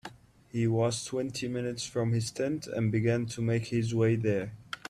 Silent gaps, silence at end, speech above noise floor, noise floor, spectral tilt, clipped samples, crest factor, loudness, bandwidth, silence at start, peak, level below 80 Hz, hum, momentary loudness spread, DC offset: none; 0 s; 21 dB; -50 dBFS; -6 dB/octave; under 0.1%; 14 dB; -31 LUFS; 13 kHz; 0.05 s; -16 dBFS; -62 dBFS; none; 6 LU; under 0.1%